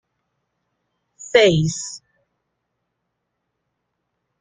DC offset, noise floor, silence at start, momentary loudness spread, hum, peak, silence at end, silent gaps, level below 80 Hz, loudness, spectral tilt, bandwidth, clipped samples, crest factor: under 0.1%; -76 dBFS; 1.2 s; 19 LU; none; -2 dBFS; 2.45 s; none; -56 dBFS; -17 LUFS; -4.5 dB/octave; 9.6 kHz; under 0.1%; 22 dB